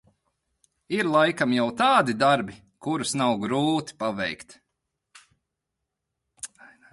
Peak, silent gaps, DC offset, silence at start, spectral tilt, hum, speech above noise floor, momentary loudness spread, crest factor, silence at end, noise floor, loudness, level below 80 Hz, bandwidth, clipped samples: -6 dBFS; none; under 0.1%; 0.9 s; -4.5 dB/octave; none; 59 dB; 19 LU; 20 dB; 0.45 s; -83 dBFS; -24 LUFS; -66 dBFS; 11.5 kHz; under 0.1%